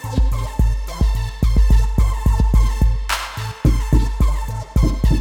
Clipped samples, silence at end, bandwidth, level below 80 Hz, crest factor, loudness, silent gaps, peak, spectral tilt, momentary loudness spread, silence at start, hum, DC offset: under 0.1%; 0 s; 14.5 kHz; -16 dBFS; 14 dB; -19 LUFS; none; -2 dBFS; -6 dB/octave; 5 LU; 0 s; none; under 0.1%